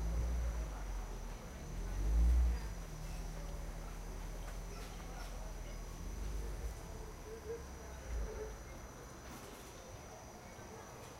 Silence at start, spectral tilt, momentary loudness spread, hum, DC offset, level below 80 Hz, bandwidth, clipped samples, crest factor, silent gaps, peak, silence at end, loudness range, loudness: 0 s; -5.5 dB/octave; 13 LU; none; under 0.1%; -42 dBFS; 15.5 kHz; under 0.1%; 16 dB; none; -24 dBFS; 0 s; 8 LU; -44 LUFS